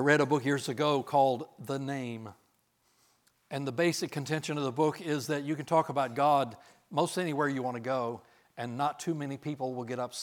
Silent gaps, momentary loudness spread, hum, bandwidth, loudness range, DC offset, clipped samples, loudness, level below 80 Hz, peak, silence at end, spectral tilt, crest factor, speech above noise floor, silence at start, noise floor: none; 11 LU; none; 18.5 kHz; 4 LU; under 0.1%; under 0.1%; -31 LUFS; -82 dBFS; -10 dBFS; 0 s; -5.5 dB/octave; 20 dB; 41 dB; 0 s; -72 dBFS